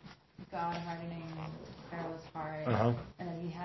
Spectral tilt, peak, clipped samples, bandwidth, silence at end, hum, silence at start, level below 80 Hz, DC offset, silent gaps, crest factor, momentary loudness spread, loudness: -6.5 dB/octave; -16 dBFS; under 0.1%; 6 kHz; 0 s; none; 0 s; -62 dBFS; under 0.1%; none; 22 dB; 14 LU; -38 LUFS